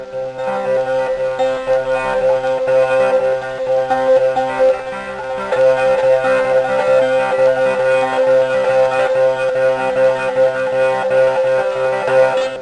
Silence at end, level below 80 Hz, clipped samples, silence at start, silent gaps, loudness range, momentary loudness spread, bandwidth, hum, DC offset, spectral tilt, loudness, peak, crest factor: 0 s; -50 dBFS; under 0.1%; 0 s; none; 2 LU; 5 LU; 10 kHz; none; under 0.1%; -4.5 dB/octave; -15 LUFS; -2 dBFS; 12 dB